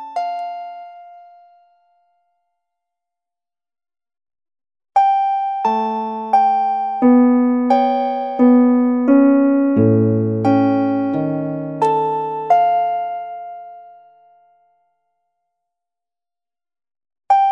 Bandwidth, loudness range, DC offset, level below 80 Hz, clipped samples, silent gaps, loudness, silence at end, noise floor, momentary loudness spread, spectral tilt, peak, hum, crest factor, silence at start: 6.6 kHz; 11 LU; under 0.1%; -68 dBFS; under 0.1%; none; -16 LUFS; 0 s; under -90 dBFS; 13 LU; -9.5 dB/octave; -2 dBFS; none; 16 dB; 0 s